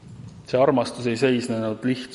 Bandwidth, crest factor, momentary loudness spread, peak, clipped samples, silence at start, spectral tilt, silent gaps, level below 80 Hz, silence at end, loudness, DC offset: 11.5 kHz; 18 dB; 11 LU; -6 dBFS; under 0.1%; 0.05 s; -6 dB/octave; none; -60 dBFS; 0 s; -23 LUFS; under 0.1%